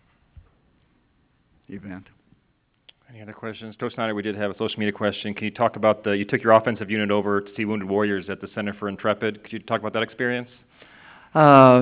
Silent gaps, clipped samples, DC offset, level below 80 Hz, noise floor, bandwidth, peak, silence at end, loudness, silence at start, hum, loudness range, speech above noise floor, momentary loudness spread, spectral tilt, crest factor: none; under 0.1%; under 0.1%; -60 dBFS; -67 dBFS; 4 kHz; 0 dBFS; 0 s; -22 LUFS; 1.7 s; none; 11 LU; 45 dB; 19 LU; -10 dB/octave; 22 dB